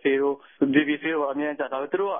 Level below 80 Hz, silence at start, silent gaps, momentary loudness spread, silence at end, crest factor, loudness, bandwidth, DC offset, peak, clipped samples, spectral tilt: -70 dBFS; 0.05 s; none; 6 LU; 0 s; 18 dB; -25 LUFS; 3.7 kHz; under 0.1%; -6 dBFS; under 0.1%; -10 dB/octave